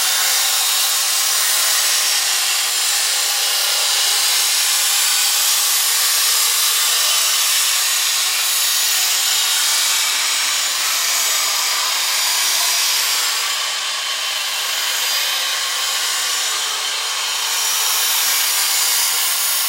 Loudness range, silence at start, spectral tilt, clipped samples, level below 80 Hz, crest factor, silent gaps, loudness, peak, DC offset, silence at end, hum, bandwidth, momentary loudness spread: 4 LU; 0 s; 6 dB/octave; under 0.1%; under -90 dBFS; 16 dB; none; -14 LUFS; -2 dBFS; under 0.1%; 0 s; none; 16 kHz; 4 LU